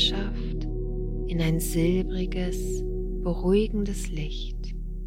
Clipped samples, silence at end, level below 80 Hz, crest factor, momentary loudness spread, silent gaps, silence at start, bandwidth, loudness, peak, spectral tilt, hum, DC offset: under 0.1%; 0 s; -30 dBFS; 16 dB; 10 LU; none; 0 s; 16.5 kHz; -28 LUFS; -12 dBFS; -5.5 dB/octave; none; under 0.1%